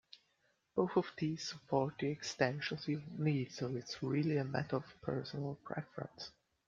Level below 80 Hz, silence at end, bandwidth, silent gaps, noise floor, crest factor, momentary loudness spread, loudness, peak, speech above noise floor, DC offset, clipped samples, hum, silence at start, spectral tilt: -74 dBFS; 0.4 s; 7.6 kHz; none; -78 dBFS; 22 dB; 10 LU; -39 LUFS; -16 dBFS; 40 dB; under 0.1%; under 0.1%; none; 0.15 s; -6 dB/octave